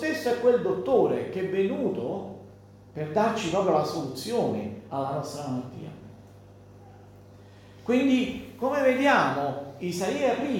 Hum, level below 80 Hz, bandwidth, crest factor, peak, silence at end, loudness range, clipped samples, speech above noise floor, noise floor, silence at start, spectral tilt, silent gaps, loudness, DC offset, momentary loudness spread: 50 Hz at -50 dBFS; -62 dBFS; 17 kHz; 20 dB; -8 dBFS; 0 s; 7 LU; under 0.1%; 24 dB; -50 dBFS; 0 s; -5.5 dB/octave; none; -26 LUFS; under 0.1%; 14 LU